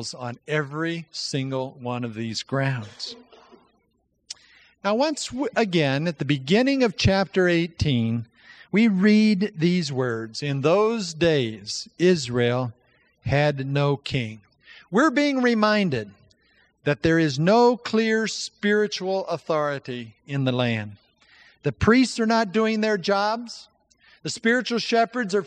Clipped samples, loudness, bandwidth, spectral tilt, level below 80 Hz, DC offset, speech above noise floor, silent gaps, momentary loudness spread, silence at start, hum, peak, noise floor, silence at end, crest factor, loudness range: under 0.1%; -23 LUFS; 9.8 kHz; -5.5 dB/octave; -50 dBFS; under 0.1%; 47 dB; none; 12 LU; 0 s; none; -4 dBFS; -70 dBFS; 0 s; 18 dB; 7 LU